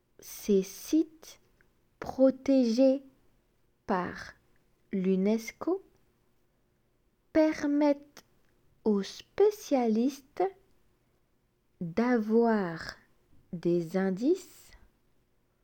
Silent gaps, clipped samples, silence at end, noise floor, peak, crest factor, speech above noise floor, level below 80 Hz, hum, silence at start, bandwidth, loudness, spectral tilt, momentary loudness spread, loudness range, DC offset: none; under 0.1%; 1.2 s; -72 dBFS; -12 dBFS; 18 dB; 44 dB; -66 dBFS; none; 0.25 s; 17.5 kHz; -29 LUFS; -6.5 dB/octave; 14 LU; 5 LU; under 0.1%